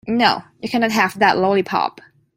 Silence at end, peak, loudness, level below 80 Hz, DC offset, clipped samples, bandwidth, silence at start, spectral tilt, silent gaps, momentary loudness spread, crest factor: 0.45 s; -2 dBFS; -18 LUFS; -58 dBFS; under 0.1%; under 0.1%; 16 kHz; 0.05 s; -4.5 dB/octave; none; 9 LU; 18 dB